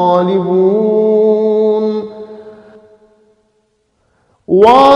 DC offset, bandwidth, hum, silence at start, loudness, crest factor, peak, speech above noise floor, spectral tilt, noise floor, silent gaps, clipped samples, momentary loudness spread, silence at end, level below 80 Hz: under 0.1%; 8.2 kHz; none; 0 s; -11 LUFS; 12 dB; 0 dBFS; 52 dB; -7.5 dB/octave; -60 dBFS; none; 0.3%; 16 LU; 0 s; -54 dBFS